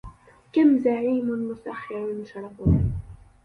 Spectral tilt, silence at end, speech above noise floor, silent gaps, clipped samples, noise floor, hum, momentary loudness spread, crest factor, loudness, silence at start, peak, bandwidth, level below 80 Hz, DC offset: -10.5 dB/octave; 0.3 s; 23 dB; none; under 0.1%; -46 dBFS; none; 15 LU; 16 dB; -24 LUFS; 0.05 s; -8 dBFS; 4.9 kHz; -38 dBFS; under 0.1%